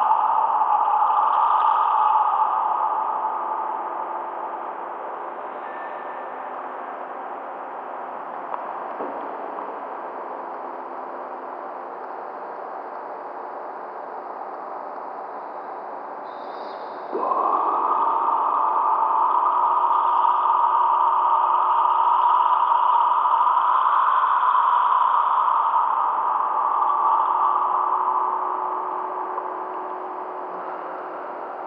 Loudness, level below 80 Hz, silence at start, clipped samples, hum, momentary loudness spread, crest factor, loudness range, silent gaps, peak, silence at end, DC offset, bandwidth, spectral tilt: -21 LUFS; under -90 dBFS; 0 s; under 0.1%; none; 15 LU; 16 dB; 15 LU; none; -6 dBFS; 0 s; under 0.1%; 5.2 kHz; -5.5 dB/octave